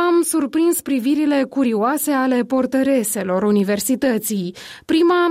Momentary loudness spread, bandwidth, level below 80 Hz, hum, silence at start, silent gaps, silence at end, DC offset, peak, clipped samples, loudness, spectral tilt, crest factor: 4 LU; 16 kHz; -60 dBFS; none; 0 s; none; 0 s; under 0.1%; -8 dBFS; under 0.1%; -18 LUFS; -4.5 dB/octave; 10 dB